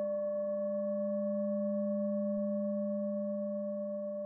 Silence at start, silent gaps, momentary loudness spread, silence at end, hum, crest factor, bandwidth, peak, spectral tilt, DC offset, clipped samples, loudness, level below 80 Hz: 0 s; none; 3 LU; 0 s; none; 8 dB; 1.8 kHz; -26 dBFS; -9.5 dB/octave; under 0.1%; under 0.1%; -35 LUFS; -84 dBFS